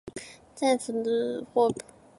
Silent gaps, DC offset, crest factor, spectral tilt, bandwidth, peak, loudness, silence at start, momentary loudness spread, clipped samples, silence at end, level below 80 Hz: none; under 0.1%; 18 dB; -4.5 dB/octave; 11.5 kHz; -10 dBFS; -27 LUFS; 0.05 s; 16 LU; under 0.1%; 0.4 s; -66 dBFS